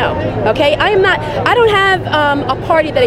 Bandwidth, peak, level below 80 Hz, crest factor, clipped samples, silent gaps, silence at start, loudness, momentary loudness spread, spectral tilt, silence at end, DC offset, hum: 13 kHz; 0 dBFS; -34 dBFS; 12 dB; under 0.1%; none; 0 s; -12 LUFS; 6 LU; -5.5 dB/octave; 0 s; under 0.1%; none